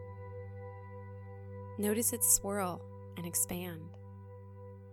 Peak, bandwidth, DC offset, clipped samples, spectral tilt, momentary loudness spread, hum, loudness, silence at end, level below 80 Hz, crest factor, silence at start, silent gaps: -12 dBFS; 18 kHz; under 0.1%; under 0.1%; -3.5 dB/octave; 24 LU; none; -32 LUFS; 0 s; -62 dBFS; 26 dB; 0 s; none